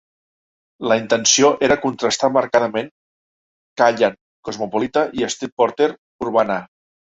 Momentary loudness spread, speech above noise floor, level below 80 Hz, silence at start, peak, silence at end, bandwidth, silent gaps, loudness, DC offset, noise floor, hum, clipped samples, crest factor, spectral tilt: 13 LU; over 72 dB; -56 dBFS; 0.8 s; -2 dBFS; 0.55 s; 8 kHz; 2.91-3.76 s, 4.21-4.43 s, 5.52-5.57 s, 5.98-6.19 s; -18 LUFS; under 0.1%; under -90 dBFS; none; under 0.1%; 18 dB; -2.5 dB/octave